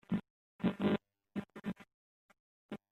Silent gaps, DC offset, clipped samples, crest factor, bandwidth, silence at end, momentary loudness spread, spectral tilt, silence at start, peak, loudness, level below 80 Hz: 0.30-0.59 s, 1.94-2.29 s, 2.40-2.69 s; under 0.1%; under 0.1%; 20 dB; 8.4 kHz; 0.15 s; 16 LU; -8.5 dB/octave; 0.1 s; -20 dBFS; -39 LUFS; -70 dBFS